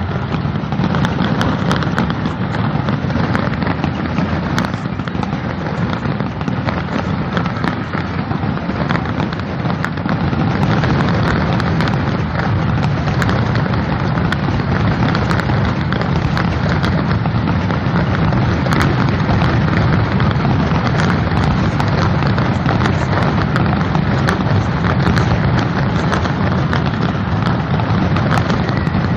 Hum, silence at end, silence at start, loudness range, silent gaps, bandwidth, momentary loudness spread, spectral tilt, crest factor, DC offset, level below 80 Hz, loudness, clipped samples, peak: none; 0 s; 0 s; 4 LU; none; 9.8 kHz; 5 LU; -7.5 dB/octave; 16 dB; under 0.1%; -30 dBFS; -16 LUFS; under 0.1%; 0 dBFS